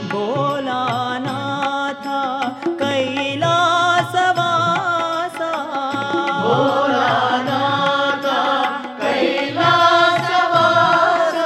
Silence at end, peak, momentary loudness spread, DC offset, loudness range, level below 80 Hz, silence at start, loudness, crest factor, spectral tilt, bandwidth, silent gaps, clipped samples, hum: 0 s; -2 dBFS; 9 LU; under 0.1%; 4 LU; -68 dBFS; 0 s; -17 LUFS; 16 dB; -4.5 dB/octave; 14 kHz; none; under 0.1%; none